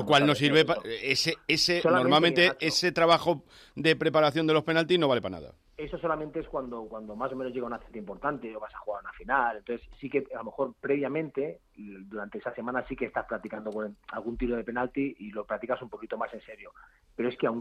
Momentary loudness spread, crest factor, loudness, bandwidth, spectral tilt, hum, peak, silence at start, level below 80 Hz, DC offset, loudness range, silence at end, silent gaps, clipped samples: 17 LU; 20 dB; -28 LUFS; 15 kHz; -4.5 dB/octave; none; -10 dBFS; 0 s; -56 dBFS; under 0.1%; 11 LU; 0 s; none; under 0.1%